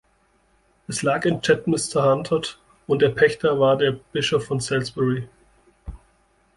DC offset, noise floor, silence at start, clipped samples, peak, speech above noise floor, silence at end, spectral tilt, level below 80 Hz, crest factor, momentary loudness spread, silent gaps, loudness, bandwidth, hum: under 0.1%; -63 dBFS; 0.9 s; under 0.1%; -4 dBFS; 42 dB; 0.6 s; -5 dB/octave; -50 dBFS; 20 dB; 15 LU; none; -21 LUFS; 11.5 kHz; none